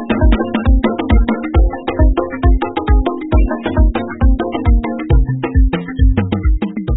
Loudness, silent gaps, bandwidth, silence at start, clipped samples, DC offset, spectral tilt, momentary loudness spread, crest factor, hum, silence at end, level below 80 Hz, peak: -15 LUFS; none; 4 kHz; 0 s; under 0.1%; 1%; -13 dB/octave; 3 LU; 12 dB; none; 0 s; -14 dBFS; 0 dBFS